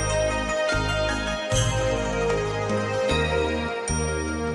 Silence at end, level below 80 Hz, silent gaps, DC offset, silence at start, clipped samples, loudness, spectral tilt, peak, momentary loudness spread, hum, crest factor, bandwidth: 0 s; -34 dBFS; none; under 0.1%; 0 s; under 0.1%; -24 LUFS; -4.5 dB/octave; -10 dBFS; 4 LU; none; 14 dB; 12 kHz